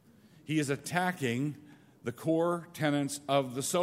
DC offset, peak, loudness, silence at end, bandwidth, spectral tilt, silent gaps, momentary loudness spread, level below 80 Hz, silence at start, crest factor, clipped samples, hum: under 0.1%; -12 dBFS; -32 LUFS; 0 s; 16 kHz; -5 dB/octave; none; 11 LU; -74 dBFS; 0.45 s; 20 dB; under 0.1%; none